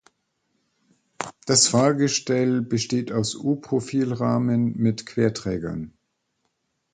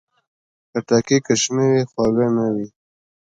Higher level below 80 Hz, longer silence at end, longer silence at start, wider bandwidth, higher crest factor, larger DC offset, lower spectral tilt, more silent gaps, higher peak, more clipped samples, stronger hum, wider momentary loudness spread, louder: about the same, -56 dBFS vs -54 dBFS; first, 1.05 s vs 0.55 s; first, 1.2 s vs 0.75 s; about the same, 9.4 kHz vs 9.4 kHz; about the same, 20 dB vs 18 dB; neither; about the same, -4.5 dB/octave vs -5 dB/octave; neither; about the same, -4 dBFS vs -2 dBFS; neither; neither; first, 14 LU vs 11 LU; second, -22 LUFS vs -19 LUFS